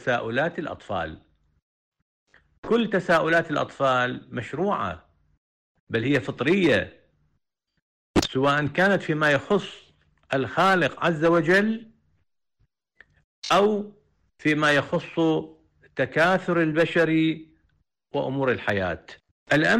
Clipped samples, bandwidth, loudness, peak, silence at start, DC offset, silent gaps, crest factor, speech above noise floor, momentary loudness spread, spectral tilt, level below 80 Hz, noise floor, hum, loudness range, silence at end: under 0.1%; 14.5 kHz; -23 LUFS; -12 dBFS; 0 s; under 0.1%; 1.62-1.92 s, 2.02-2.27 s, 2.58-2.63 s, 5.37-5.87 s, 7.82-8.14 s, 13.24-13.42 s, 19.31-19.46 s; 12 dB; 52 dB; 13 LU; -5.5 dB/octave; -54 dBFS; -75 dBFS; none; 4 LU; 0 s